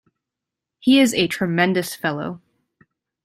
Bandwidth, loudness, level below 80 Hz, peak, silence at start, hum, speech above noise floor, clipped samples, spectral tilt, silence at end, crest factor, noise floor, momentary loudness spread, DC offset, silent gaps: 15.5 kHz; -19 LUFS; -60 dBFS; -4 dBFS; 0.85 s; none; 66 dB; under 0.1%; -4.5 dB/octave; 0.85 s; 18 dB; -85 dBFS; 14 LU; under 0.1%; none